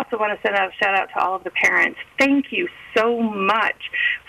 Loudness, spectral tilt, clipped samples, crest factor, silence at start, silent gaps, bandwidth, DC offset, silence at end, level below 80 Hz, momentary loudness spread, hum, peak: -20 LUFS; -4 dB/octave; under 0.1%; 14 dB; 0 s; none; 15.5 kHz; under 0.1%; 0.1 s; -60 dBFS; 6 LU; none; -6 dBFS